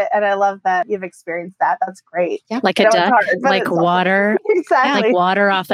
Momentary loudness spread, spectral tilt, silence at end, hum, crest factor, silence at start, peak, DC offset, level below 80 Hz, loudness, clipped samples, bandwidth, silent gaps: 9 LU; -5 dB/octave; 0 s; none; 16 dB; 0 s; 0 dBFS; under 0.1%; -74 dBFS; -16 LUFS; under 0.1%; 15.5 kHz; none